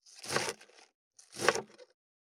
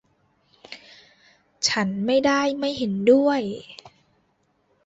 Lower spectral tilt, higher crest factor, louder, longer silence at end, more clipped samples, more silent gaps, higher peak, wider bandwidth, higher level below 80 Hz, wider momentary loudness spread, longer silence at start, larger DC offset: second, -2 dB/octave vs -4 dB/octave; first, 34 dB vs 18 dB; second, -34 LUFS vs -21 LUFS; second, 0.5 s vs 1 s; neither; first, 0.94-1.11 s vs none; about the same, -6 dBFS vs -6 dBFS; first, 18.5 kHz vs 8 kHz; second, -78 dBFS vs -64 dBFS; second, 18 LU vs 24 LU; second, 0.05 s vs 0.7 s; neither